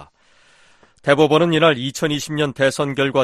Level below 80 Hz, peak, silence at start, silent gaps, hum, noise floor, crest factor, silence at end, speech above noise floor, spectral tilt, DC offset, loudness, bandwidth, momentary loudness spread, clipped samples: -56 dBFS; 0 dBFS; 0 s; none; none; -54 dBFS; 18 dB; 0 s; 37 dB; -5 dB/octave; under 0.1%; -17 LUFS; 13.5 kHz; 8 LU; under 0.1%